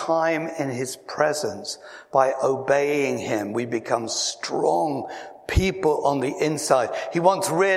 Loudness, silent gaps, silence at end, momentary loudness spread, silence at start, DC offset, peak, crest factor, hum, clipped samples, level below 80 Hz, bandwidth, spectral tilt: -23 LUFS; none; 0 s; 9 LU; 0 s; under 0.1%; -2 dBFS; 20 dB; none; under 0.1%; -40 dBFS; 16 kHz; -4 dB/octave